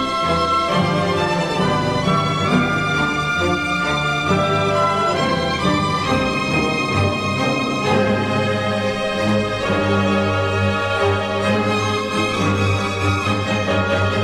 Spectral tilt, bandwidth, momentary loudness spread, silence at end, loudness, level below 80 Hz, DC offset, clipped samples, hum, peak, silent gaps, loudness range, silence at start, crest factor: -5.5 dB/octave; 13.5 kHz; 2 LU; 0 s; -18 LUFS; -42 dBFS; 0.3%; under 0.1%; none; -4 dBFS; none; 1 LU; 0 s; 14 dB